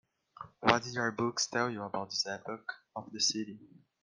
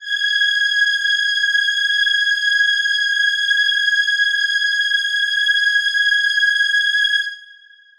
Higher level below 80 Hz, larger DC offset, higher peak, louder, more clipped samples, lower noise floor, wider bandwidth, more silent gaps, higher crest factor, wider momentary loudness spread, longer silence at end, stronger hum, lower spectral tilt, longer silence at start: second, -74 dBFS vs -66 dBFS; neither; second, -10 dBFS vs -6 dBFS; second, -33 LUFS vs -15 LUFS; neither; first, -52 dBFS vs -46 dBFS; second, 11.5 kHz vs 14 kHz; neither; first, 26 dB vs 12 dB; first, 16 LU vs 2 LU; about the same, 0.35 s vs 0.45 s; neither; first, -2.5 dB/octave vs 7 dB/octave; first, 0.4 s vs 0 s